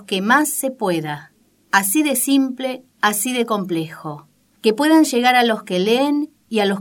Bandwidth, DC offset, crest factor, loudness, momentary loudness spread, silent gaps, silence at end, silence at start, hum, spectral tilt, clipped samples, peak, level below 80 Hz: 17.5 kHz; under 0.1%; 18 dB; -18 LUFS; 13 LU; none; 0 s; 0 s; none; -3.5 dB/octave; under 0.1%; 0 dBFS; -72 dBFS